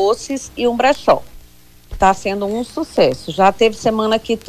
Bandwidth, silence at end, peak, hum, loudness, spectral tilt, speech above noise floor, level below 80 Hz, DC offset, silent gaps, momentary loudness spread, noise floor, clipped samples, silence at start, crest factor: 15.5 kHz; 0.1 s; -2 dBFS; 60 Hz at -50 dBFS; -16 LUFS; -4.5 dB/octave; 30 dB; -40 dBFS; under 0.1%; none; 8 LU; -46 dBFS; under 0.1%; 0 s; 14 dB